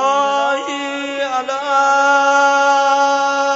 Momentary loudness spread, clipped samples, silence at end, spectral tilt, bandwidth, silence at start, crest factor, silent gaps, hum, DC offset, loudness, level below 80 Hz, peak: 9 LU; under 0.1%; 0 s; -1 dB/octave; 8 kHz; 0 s; 14 dB; none; none; under 0.1%; -15 LUFS; -72 dBFS; -2 dBFS